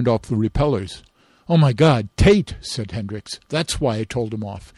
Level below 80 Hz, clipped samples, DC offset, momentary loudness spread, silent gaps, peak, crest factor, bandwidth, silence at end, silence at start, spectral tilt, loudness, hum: -34 dBFS; under 0.1%; under 0.1%; 14 LU; none; -4 dBFS; 14 dB; 12.5 kHz; 0.2 s; 0 s; -6.5 dB/octave; -20 LUFS; none